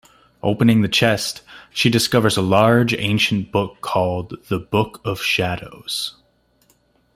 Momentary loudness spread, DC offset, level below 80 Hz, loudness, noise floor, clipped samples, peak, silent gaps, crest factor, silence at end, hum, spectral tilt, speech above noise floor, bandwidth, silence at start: 11 LU; under 0.1%; -52 dBFS; -19 LUFS; -60 dBFS; under 0.1%; 0 dBFS; none; 18 dB; 1.05 s; none; -5 dB/octave; 41 dB; 16 kHz; 0.45 s